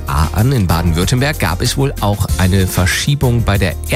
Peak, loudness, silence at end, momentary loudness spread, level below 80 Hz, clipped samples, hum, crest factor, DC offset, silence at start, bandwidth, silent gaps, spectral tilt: -2 dBFS; -14 LUFS; 0 s; 3 LU; -22 dBFS; under 0.1%; none; 10 dB; under 0.1%; 0 s; 16.5 kHz; none; -5 dB/octave